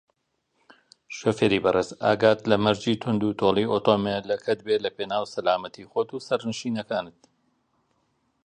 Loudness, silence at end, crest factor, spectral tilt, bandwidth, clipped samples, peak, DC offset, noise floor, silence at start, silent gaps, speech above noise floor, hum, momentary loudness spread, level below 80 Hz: -25 LUFS; 1.35 s; 20 dB; -5.5 dB/octave; 10 kHz; under 0.1%; -4 dBFS; under 0.1%; -74 dBFS; 1.1 s; none; 50 dB; none; 9 LU; -60 dBFS